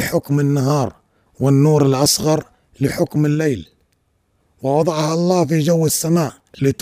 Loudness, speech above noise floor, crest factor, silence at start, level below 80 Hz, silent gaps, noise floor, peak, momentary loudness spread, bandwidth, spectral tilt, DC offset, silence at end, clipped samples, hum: -17 LUFS; 48 dB; 14 dB; 0 s; -50 dBFS; none; -64 dBFS; -2 dBFS; 8 LU; 16 kHz; -5.5 dB/octave; under 0.1%; 0.1 s; under 0.1%; none